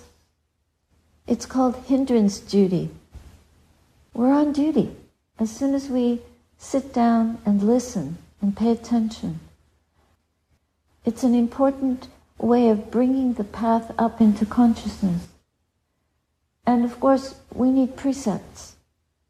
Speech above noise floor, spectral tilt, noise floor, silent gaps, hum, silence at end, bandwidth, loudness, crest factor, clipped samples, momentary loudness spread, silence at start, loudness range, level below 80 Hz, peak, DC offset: 51 dB; -7 dB/octave; -72 dBFS; none; none; 0.6 s; 11 kHz; -22 LUFS; 16 dB; under 0.1%; 11 LU; 1.3 s; 5 LU; -52 dBFS; -6 dBFS; under 0.1%